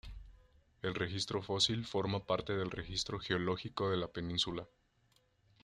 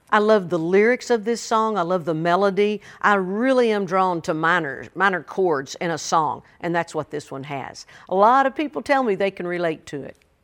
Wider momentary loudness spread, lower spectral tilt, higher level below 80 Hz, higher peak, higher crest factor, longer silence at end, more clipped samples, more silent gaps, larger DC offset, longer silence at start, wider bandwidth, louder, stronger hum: second, 10 LU vs 14 LU; about the same, -4.5 dB/octave vs -5 dB/octave; first, -58 dBFS vs -64 dBFS; second, -16 dBFS vs -2 dBFS; about the same, 22 dB vs 18 dB; first, 0.95 s vs 0.3 s; neither; neither; neither; about the same, 0.05 s vs 0.1 s; second, 11.5 kHz vs 16.5 kHz; second, -37 LUFS vs -21 LUFS; neither